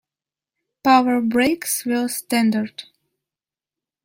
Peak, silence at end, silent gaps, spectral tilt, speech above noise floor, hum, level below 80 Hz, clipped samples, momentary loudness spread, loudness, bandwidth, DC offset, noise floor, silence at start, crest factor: -2 dBFS; 1.2 s; none; -3.5 dB/octave; over 70 dB; none; -62 dBFS; under 0.1%; 9 LU; -19 LUFS; 16.5 kHz; under 0.1%; under -90 dBFS; 0.85 s; 18 dB